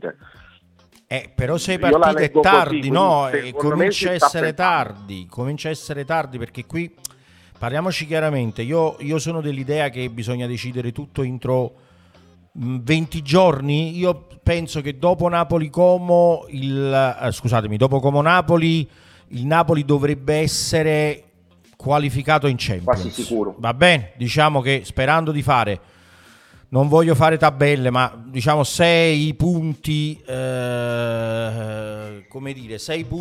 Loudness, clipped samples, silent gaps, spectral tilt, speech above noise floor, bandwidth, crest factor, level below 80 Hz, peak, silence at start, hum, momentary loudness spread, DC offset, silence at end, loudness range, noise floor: -19 LUFS; under 0.1%; none; -5.5 dB/octave; 35 dB; 15.5 kHz; 20 dB; -46 dBFS; 0 dBFS; 0.05 s; none; 13 LU; under 0.1%; 0 s; 8 LU; -54 dBFS